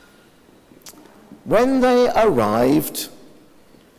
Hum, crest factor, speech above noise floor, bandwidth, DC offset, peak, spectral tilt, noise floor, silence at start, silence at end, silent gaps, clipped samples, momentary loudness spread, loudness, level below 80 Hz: none; 16 dB; 35 dB; 16 kHz; under 0.1%; -4 dBFS; -5.5 dB/octave; -51 dBFS; 0.85 s; 0.9 s; none; under 0.1%; 14 LU; -17 LUFS; -48 dBFS